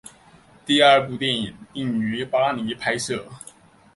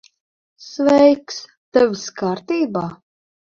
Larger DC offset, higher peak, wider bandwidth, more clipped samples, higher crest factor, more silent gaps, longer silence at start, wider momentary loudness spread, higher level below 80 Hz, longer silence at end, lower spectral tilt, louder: neither; about the same, -2 dBFS vs -2 dBFS; first, 11.5 kHz vs 7.6 kHz; neither; about the same, 22 dB vs 18 dB; second, none vs 1.57-1.72 s; about the same, 0.65 s vs 0.6 s; about the same, 16 LU vs 18 LU; about the same, -60 dBFS vs -58 dBFS; about the same, 0.55 s vs 0.45 s; second, -4 dB/octave vs -5.5 dB/octave; second, -21 LUFS vs -18 LUFS